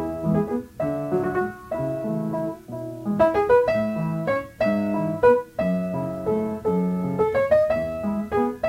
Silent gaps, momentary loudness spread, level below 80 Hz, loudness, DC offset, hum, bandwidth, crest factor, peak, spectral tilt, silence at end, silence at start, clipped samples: none; 9 LU; -50 dBFS; -23 LUFS; under 0.1%; none; 16 kHz; 18 dB; -6 dBFS; -8.5 dB/octave; 0 s; 0 s; under 0.1%